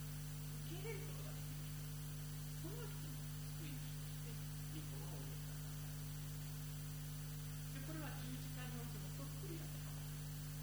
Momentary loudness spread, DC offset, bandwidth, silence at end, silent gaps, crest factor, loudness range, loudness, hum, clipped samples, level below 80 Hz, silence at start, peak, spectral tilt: 1 LU; under 0.1%; over 20 kHz; 0 s; none; 12 dB; 0 LU; -48 LUFS; 50 Hz at -50 dBFS; under 0.1%; -56 dBFS; 0 s; -36 dBFS; -5 dB/octave